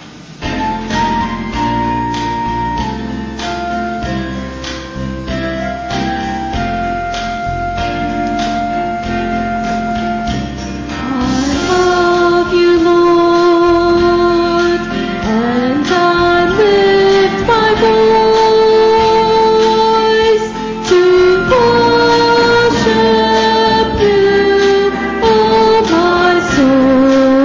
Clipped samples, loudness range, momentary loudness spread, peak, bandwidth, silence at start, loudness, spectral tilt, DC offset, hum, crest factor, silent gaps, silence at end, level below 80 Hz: under 0.1%; 9 LU; 10 LU; -2 dBFS; 7.6 kHz; 0 s; -12 LUFS; -5.5 dB/octave; under 0.1%; none; 10 dB; none; 0 s; -32 dBFS